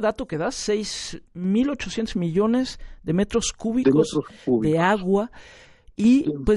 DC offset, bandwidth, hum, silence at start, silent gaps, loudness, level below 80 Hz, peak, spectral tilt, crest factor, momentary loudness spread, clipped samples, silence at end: under 0.1%; 11.5 kHz; none; 0 s; none; -23 LUFS; -42 dBFS; -6 dBFS; -5.5 dB/octave; 16 dB; 11 LU; under 0.1%; 0 s